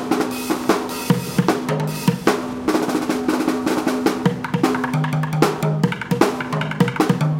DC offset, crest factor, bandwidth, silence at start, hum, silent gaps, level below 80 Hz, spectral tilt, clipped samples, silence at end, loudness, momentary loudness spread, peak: under 0.1%; 18 dB; 17 kHz; 0 s; none; none; -52 dBFS; -6 dB/octave; under 0.1%; 0 s; -20 LUFS; 3 LU; 0 dBFS